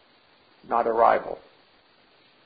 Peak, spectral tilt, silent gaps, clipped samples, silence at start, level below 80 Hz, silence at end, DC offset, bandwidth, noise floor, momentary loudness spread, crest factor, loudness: -4 dBFS; -8.5 dB/octave; none; under 0.1%; 0.7 s; -62 dBFS; 1.05 s; under 0.1%; 5 kHz; -59 dBFS; 18 LU; 22 dB; -23 LUFS